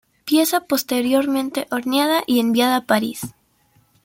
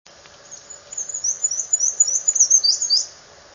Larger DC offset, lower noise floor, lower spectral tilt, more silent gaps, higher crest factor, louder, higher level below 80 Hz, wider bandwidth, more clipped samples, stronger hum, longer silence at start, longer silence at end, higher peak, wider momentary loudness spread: neither; first, -59 dBFS vs -43 dBFS; first, -3.5 dB/octave vs 4 dB/octave; neither; about the same, 18 dB vs 18 dB; second, -19 LUFS vs -16 LUFS; about the same, -62 dBFS vs -66 dBFS; first, 17 kHz vs 7.6 kHz; neither; neither; second, 0.25 s vs 0.5 s; first, 0.75 s vs 0.4 s; about the same, -2 dBFS vs -4 dBFS; second, 7 LU vs 18 LU